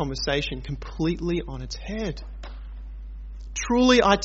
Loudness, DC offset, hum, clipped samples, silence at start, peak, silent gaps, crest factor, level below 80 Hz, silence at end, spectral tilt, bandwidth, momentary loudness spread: -25 LUFS; under 0.1%; none; under 0.1%; 0 s; -6 dBFS; none; 20 dB; -36 dBFS; 0 s; -4 dB/octave; 8 kHz; 22 LU